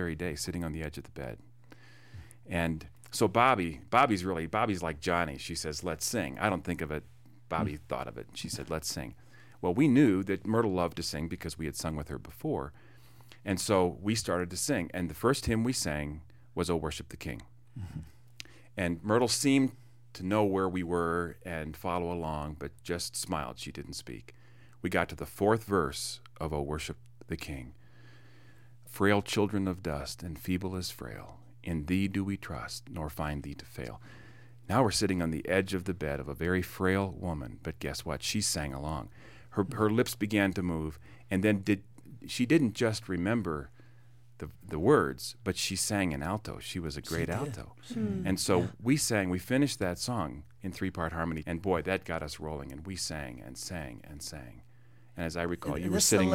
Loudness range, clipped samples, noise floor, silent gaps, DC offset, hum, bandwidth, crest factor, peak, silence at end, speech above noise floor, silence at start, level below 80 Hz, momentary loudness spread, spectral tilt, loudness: 6 LU; under 0.1%; -59 dBFS; none; 0.2%; none; 16.5 kHz; 24 dB; -8 dBFS; 0 s; 27 dB; 0 s; -52 dBFS; 16 LU; -4.5 dB/octave; -32 LUFS